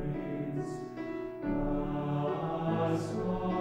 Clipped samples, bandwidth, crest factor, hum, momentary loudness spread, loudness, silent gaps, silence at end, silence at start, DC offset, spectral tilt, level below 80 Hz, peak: under 0.1%; 11 kHz; 14 dB; none; 7 LU; -34 LUFS; none; 0 s; 0 s; under 0.1%; -8 dB/octave; -48 dBFS; -20 dBFS